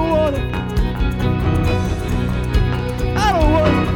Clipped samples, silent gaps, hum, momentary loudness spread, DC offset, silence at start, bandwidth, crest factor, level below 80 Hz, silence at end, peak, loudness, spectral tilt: under 0.1%; none; none; 6 LU; under 0.1%; 0 s; 17.5 kHz; 14 dB; -22 dBFS; 0 s; -2 dBFS; -18 LUFS; -7 dB/octave